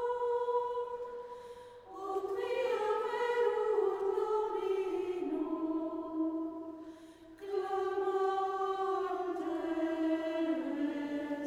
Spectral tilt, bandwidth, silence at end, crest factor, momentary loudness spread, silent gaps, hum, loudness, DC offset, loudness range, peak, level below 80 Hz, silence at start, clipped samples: -5 dB/octave; 13 kHz; 0 s; 16 dB; 14 LU; none; none; -35 LUFS; under 0.1%; 4 LU; -20 dBFS; -72 dBFS; 0 s; under 0.1%